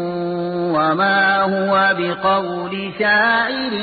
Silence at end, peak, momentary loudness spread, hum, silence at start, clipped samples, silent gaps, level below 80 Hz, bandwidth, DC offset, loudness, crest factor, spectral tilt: 0 s; -4 dBFS; 8 LU; none; 0 s; under 0.1%; none; -56 dBFS; 4.8 kHz; under 0.1%; -17 LUFS; 12 dB; -10.5 dB/octave